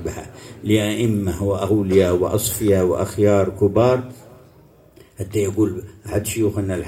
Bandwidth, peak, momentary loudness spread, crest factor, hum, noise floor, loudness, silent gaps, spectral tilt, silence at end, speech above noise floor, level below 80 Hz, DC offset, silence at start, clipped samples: 16.5 kHz; -2 dBFS; 14 LU; 18 dB; none; -49 dBFS; -19 LUFS; none; -6 dB/octave; 0 s; 31 dB; -46 dBFS; under 0.1%; 0 s; under 0.1%